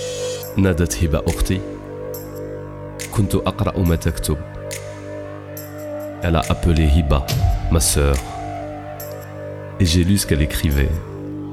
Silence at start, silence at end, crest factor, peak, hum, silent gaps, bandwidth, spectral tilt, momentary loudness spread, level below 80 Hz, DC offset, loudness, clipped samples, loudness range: 0 s; 0 s; 16 dB; -4 dBFS; 50 Hz at -40 dBFS; none; 16 kHz; -5.5 dB/octave; 15 LU; -26 dBFS; under 0.1%; -20 LUFS; under 0.1%; 4 LU